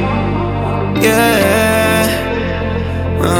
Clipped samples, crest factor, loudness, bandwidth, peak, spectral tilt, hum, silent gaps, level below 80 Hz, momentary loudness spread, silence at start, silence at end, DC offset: under 0.1%; 14 dB; -14 LUFS; 19.5 kHz; 0 dBFS; -5 dB/octave; none; none; -30 dBFS; 8 LU; 0 s; 0 s; under 0.1%